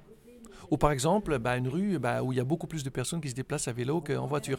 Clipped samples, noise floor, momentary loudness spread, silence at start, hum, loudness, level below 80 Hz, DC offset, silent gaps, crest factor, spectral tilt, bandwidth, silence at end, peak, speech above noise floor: under 0.1%; -52 dBFS; 7 LU; 0 s; none; -30 LUFS; -48 dBFS; under 0.1%; none; 20 dB; -5.5 dB/octave; 17 kHz; 0 s; -10 dBFS; 22 dB